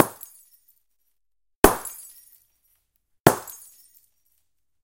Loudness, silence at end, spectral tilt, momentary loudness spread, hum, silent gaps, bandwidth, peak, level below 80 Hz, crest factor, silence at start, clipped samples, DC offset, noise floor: -21 LUFS; 1.35 s; -4.5 dB/octave; 24 LU; none; 1.56-1.63 s, 3.20-3.24 s; 17 kHz; 0 dBFS; -44 dBFS; 26 dB; 0 s; under 0.1%; under 0.1%; -79 dBFS